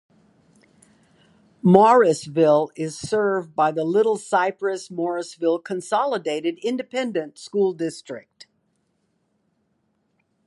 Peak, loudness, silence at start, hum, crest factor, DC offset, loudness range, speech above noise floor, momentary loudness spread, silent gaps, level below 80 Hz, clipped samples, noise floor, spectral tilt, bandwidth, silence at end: 0 dBFS; -21 LUFS; 1.65 s; none; 22 dB; under 0.1%; 10 LU; 49 dB; 13 LU; none; -68 dBFS; under 0.1%; -70 dBFS; -6 dB/octave; 11.5 kHz; 2.3 s